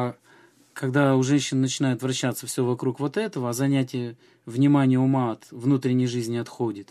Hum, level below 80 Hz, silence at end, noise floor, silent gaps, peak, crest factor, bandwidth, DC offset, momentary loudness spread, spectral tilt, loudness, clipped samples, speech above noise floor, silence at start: none; -70 dBFS; 0.05 s; -56 dBFS; none; -6 dBFS; 18 dB; 14.5 kHz; under 0.1%; 10 LU; -6 dB/octave; -24 LUFS; under 0.1%; 32 dB; 0 s